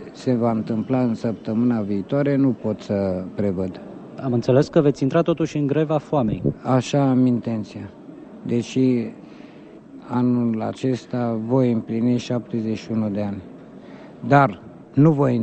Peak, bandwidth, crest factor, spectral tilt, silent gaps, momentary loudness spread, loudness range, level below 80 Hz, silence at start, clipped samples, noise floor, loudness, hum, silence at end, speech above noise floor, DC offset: -2 dBFS; 8.6 kHz; 18 dB; -8 dB/octave; none; 18 LU; 4 LU; -54 dBFS; 0 s; under 0.1%; -42 dBFS; -21 LUFS; none; 0 s; 22 dB; under 0.1%